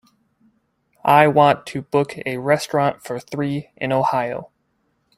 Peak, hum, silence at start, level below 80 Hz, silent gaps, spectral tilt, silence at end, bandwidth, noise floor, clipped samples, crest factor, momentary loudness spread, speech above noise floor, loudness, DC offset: 0 dBFS; none; 1.05 s; -60 dBFS; none; -6 dB/octave; 0.7 s; 15.5 kHz; -68 dBFS; under 0.1%; 20 dB; 13 LU; 49 dB; -19 LUFS; under 0.1%